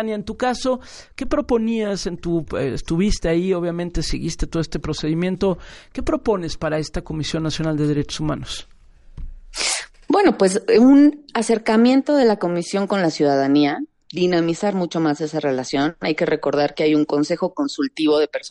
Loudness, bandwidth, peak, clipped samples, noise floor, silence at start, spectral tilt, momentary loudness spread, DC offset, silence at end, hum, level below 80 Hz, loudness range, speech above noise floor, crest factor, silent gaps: -20 LUFS; 11.5 kHz; -4 dBFS; under 0.1%; -39 dBFS; 0 s; -5.5 dB/octave; 10 LU; under 0.1%; 0 s; none; -36 dBFS; 7 LU; 20 dB; 16 dB; none